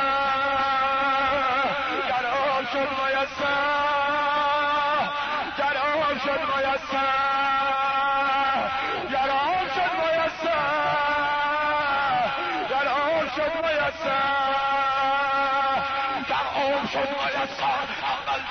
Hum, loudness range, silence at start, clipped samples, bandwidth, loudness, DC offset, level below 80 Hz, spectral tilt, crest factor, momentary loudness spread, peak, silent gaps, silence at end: none; 1 LU; 0 s; under 0.1%; 6.6 kHz; -24 LUFS; under 0.1%; -54 dBFS; -4 dB/octave; 8 dB; 3 LU; -16 dBFS; none; 0 s